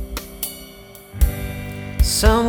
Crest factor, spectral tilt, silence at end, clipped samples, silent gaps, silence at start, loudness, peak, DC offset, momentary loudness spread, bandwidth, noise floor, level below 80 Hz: 20 dB; -4.5 dB/octave; 0 s; under 0.1%; none; 0 s; -22 LUFS; 0 dBFS; under 0.1%; 21 LU; over 20 kHz; -41 dBFS; -22 dBFS